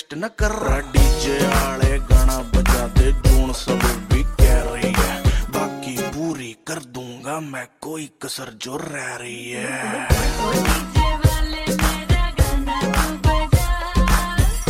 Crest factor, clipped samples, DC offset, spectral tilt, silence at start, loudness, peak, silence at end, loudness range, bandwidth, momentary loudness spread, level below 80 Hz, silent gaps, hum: 18 dB; under 0.1%; under 0.1%; -5 dB/octave; 0.1 s; -20 LUFS; 0 dBFS; 0 s; 10 LU; 16.5 kHz; 12 LU; -20 dBFS; none; none